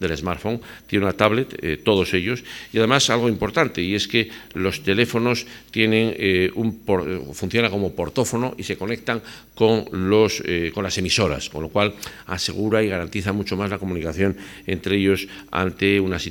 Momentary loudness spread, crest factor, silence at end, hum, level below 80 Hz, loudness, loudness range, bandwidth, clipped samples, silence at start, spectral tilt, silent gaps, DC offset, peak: 9 LU; 22 dB; 0 s; none; -46 dBFS; -22 LUFS; 3 LU; 19 kHz; under 0.1%; 0 s; -4.5 dB/octave; none; under 0.1%; 0 dBFS